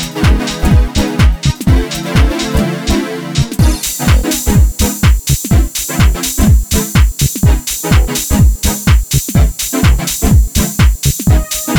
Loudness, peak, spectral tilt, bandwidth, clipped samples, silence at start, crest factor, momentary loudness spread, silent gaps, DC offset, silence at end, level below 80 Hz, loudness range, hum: -12 LUFS; 0 dBFS; -4.5 dB/octave; over 20 kHz; under 0.1%; 0 s; 10 dB; 4 LU; none; under 0.1%; 0 s; -14 dBFS; 2 LU; none